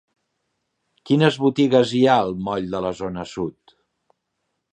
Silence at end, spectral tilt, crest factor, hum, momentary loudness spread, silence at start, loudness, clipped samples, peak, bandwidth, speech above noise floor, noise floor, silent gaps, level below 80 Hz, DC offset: 1.25 s; -6.5 dB/octave; 20 dB; none; 12 LU; 1.05 s; -20 LUFS; under 0.1%; -2 dBFS; 9.6 kHz; 57 dB; -76 dBFS; none; -56 dBFS; under 0.1%